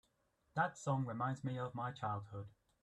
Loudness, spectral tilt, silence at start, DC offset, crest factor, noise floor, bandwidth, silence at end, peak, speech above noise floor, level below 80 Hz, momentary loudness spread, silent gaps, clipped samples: -41 LUFS; -6.5 dB/octave; 0.55 s; under 0.1%; 22 dB; -80 dBFS; 10.5 kHz; 0.3 s; -20 dBFS; 39 dB; -76 dBFS; 12 LU; none; under 0.1%